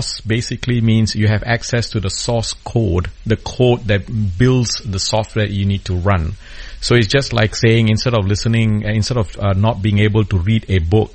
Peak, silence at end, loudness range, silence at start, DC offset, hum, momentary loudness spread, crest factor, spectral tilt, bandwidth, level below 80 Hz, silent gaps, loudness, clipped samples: 0 dBFS; 0 s; 2 LU; 0 s; under 0.1%; none; 6 LU; 16 dB; -5.5 dB/octave; 8.8 kHz; -32 dBFS; none; -16 LUFS; under 0.1%